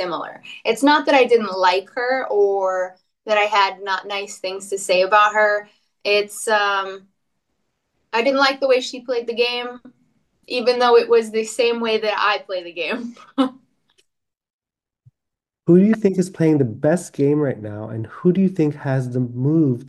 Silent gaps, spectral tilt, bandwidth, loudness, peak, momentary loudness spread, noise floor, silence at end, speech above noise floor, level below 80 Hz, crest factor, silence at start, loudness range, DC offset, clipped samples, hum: 14.50-14.59 s; -5.5 dB/octave; 12.5 kHz; -19 LUFS; -2 dBFS; 13 LU; -83 dBFS; 0 s; 65 dB; -70 dBFS; 18 dB; 0 s; 4 LU; under 0.1%; under 0.1%; none